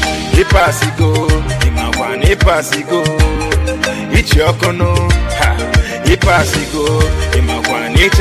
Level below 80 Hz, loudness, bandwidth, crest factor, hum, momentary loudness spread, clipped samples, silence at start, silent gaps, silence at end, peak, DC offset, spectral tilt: -16 dBFS; -13 LUFS; 15.5 kHz; 12 dB; none; 5 LU; under 0.1%; 0 s; none; 0 s; 0 dBFS; under 0.1%; -5 dB/octave